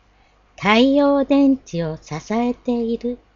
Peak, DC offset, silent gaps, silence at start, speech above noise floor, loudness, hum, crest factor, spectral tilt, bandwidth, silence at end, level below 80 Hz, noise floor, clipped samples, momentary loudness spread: 0 dBFS; under 0.1%; none; 0.6 s; 37 dB; -18 LUFS; none; 18 dB; -6 dB/octave; 7.2 kHz; 0.2 s; -48 dBFS; -55 dBFS; under 0.1%; 12 LU